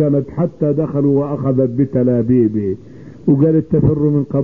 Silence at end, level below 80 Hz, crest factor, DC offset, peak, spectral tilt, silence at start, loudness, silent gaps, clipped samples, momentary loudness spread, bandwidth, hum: 0 s; -42 dBFS; 12 dB; 0.5%; -2 dBFS; -13 dB/octave; 0 s; -16 LUFS; none; under 0.1%; 7 LU; 2.8 kHz; none